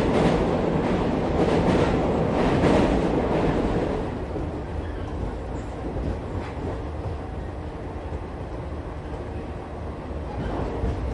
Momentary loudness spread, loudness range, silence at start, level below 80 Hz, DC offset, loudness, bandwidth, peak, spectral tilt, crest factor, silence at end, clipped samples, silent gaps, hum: 13 LU; 11 LU; 0 s; -34 dBFS; under 0.1%; -26 LUFS; 11.5 kHz; -8 dBFS; -7.5 dB/octave; 16 dB; 0 s; under 0.1%; none; none